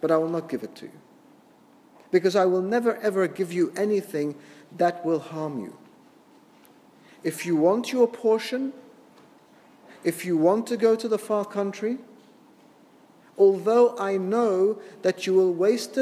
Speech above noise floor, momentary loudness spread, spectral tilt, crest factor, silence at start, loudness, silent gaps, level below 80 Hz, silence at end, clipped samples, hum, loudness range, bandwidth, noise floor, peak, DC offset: 32 dB; 13 LU; -6 dB/octave; 18 dB; 0 s; -24 LUFS; none; -82 dBFS; 0 s; under 0.1%; none; 5 LU; 15 kHz; -55 dBFS; -8 dBFS; under 0.1%